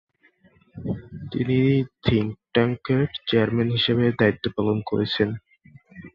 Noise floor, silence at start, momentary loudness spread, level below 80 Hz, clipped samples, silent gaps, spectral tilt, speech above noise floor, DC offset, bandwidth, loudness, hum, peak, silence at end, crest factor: -59 dBFS; 0.75 s; 12 LU; -48 dBFS; under 0.1%; none; -9 dB/octave; 38 dB; under 0.1%; 5.8 kHz; -23 LUFS; none; -4 dBFS; 0.05 s; 18 dB